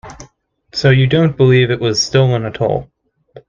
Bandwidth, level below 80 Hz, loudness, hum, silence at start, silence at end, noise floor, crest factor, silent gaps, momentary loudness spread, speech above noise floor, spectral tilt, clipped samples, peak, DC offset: 7.4 kHz; -44 dBFS; -13 LUFS; none; 0.05 s; 0.1 s; -49 dBFS; 14 dB; none; 7 LU; 36 dB; -6 dB/octave; under 0.1%; 0 dBFS; under 0.1%